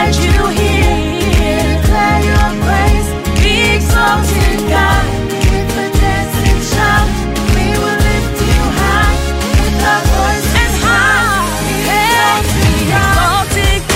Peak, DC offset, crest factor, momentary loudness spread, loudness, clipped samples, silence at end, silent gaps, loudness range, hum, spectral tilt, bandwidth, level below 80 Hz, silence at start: 0 dBFS; under 0.1%; 10 dB; 4 LU; -12 LUFS; under 0.1%; 0 s; none; 2 LU; none; -4.5 dB/octave; 16.5 kHz; -16 dBFS; 0 s